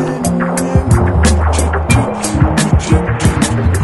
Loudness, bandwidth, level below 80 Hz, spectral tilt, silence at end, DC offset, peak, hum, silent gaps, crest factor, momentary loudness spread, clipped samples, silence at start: -13 LUFS; 12 kHz; -18 dBFS; -5.5 dB/octave; 0 s; under 0.1%; 0 dBFS; none; none; 12 dB; 3 LU; under 0.1%; 0 s